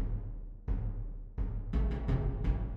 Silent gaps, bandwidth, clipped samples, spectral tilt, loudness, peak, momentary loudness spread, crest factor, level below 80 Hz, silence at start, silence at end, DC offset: none; 4.2 kHz; under 0.1%; -10 dB/octave; -37 LUFS; -18 dBFS; 11 LU; 16 dB; -34 dBFS; 0 s; 0 s; under 0.1%